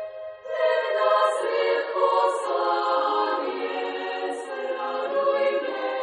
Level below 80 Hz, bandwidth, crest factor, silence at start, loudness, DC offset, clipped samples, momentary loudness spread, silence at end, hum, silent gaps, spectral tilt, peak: -82 dBFS; 10.5 kHz; 16 dB; 0 s; -24 LUFS; under 0.1%; under 0.1%; 9 LU; 0 s; none; none; -2 dB/octave; -8 dBFS